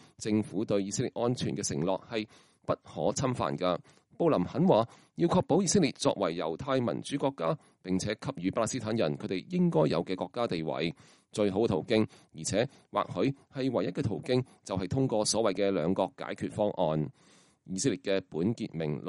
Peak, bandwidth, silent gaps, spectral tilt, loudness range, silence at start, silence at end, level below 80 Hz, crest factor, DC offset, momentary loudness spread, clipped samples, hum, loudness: -10 dBFS; 11.5 kHz; none; -5.5 dB/octave; 4 LU; 0.2 s; 0 s; -62 dBFS; 20 dB; under 0.1%; 9 LU; under 0.1%; none; -31 LUFS